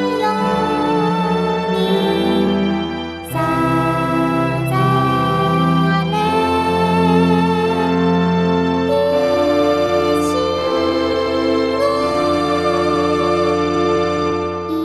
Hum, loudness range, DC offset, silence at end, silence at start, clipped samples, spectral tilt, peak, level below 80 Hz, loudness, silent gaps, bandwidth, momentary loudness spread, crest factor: none; 2 LU; under 0.1%; 0 s; 0 s; under 0.1%; -6.5 dB/octave; -2 dBFS; -42 dBFS; -16 LUFS; none; 14 kHz; 3 LU; 14 dB